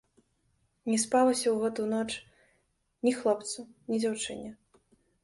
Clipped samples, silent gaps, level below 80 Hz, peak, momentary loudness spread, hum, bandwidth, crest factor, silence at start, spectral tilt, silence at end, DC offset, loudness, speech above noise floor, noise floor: under 0.1%; none; -70 dBFS; -14 dBFS; 15 LU; none; 11.5 kHz; 18 dB; 0.85 s; -3.5 dB/octave; 0.7 s; under 0.1%; -30 LUFS; 45 dB; -74 dBFS